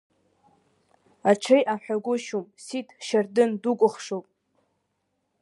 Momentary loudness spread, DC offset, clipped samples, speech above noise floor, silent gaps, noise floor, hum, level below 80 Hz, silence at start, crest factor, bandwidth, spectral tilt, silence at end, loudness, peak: 14 LU; under 0.1%; under 0.1%; 52 dB; none; -76 dBFS; none; -80 dBFS; 1.25 s; 22 dB; 11.5 kHz; -5 dB/octave; 1.2 s; -25 LUFS; -4 dBFS